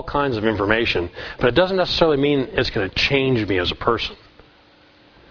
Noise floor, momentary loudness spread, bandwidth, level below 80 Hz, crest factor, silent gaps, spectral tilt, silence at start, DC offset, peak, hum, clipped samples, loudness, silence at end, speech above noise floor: -52 dBFS; 5 LU; 5.4 kHz; -40 dBFS; 20 dB; none; -6 dB/octave; 0 s; under 0.1%; 0 dBFS; none; under 0.1%; -19 LUFS; 1.15 s; 32 dB